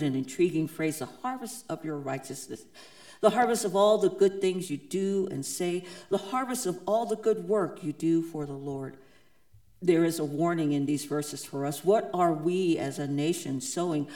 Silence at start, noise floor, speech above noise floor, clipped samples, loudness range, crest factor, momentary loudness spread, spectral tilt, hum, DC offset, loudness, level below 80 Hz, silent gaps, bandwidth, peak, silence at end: 0 s; -63 dBFS; 34 dB; under 0.1%; 4 LU; 22 dB; 11 LU; -5.5 dB/octave; none; 0.1%; -29 LUFS; -70 dBFS; none; 19 kHz; -8 dBFS; 0 s